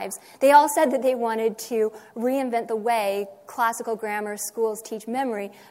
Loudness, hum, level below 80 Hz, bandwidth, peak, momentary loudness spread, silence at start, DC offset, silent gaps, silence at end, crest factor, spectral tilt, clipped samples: -24 LUFS; none; -78 dBFS; 16 kHz; -4 dBFS; 14 LU; 0 s; under 0.1%; none; 0.2 s; 20 dB; -3.5 dB/octave; under 0.1%